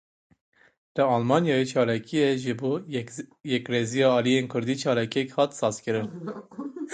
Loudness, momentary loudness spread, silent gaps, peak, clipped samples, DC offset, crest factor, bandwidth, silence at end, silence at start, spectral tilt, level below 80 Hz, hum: -25 LUFS; 14 LU; none; -6 dBFS; under 0.1%; under 0.1%; 20 dB; 9.4 kHz; 0 s; 0.95 s; -5.5 dB/octave; -68 dBFS; none